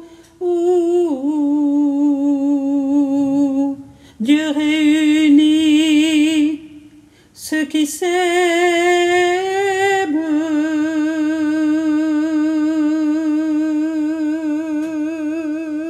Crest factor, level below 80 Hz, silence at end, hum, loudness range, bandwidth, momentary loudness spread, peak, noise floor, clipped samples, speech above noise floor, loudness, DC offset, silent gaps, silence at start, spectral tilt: 14 dB; -60 dBFS; 0 s; none; 3 LU; 14.5 kHz; 8 LU; -4 dBFS; -46 dBFS; under 0.1%; 30 dB; -16 LUFS; under 0.1%; none; 0 s; -3.5 dB/octave